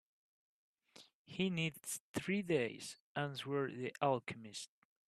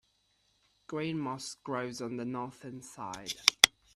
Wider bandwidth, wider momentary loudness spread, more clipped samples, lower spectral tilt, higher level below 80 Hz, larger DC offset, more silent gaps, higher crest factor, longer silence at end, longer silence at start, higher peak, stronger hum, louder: about the same, 14 kHz vs 14.5 kHz; second, 12 LU vs 19 LU; neither; first, -4.5 dB/octave vs -1.5 dB/octave; second, -80 dBFS vs -70 dBFS; neither; first, 1.14-1.25 s, 2.00-2.14 s, 3.00-3.15 s vs none; second, 22 dB vs 34 dB; about the same, 0.4 s vs 0.3 s; about the same, 0.95 s vs 0.9 s; second, -20 dBFS vs 0 dBFS; neither; second, -40 LUFS vs -31 LUFS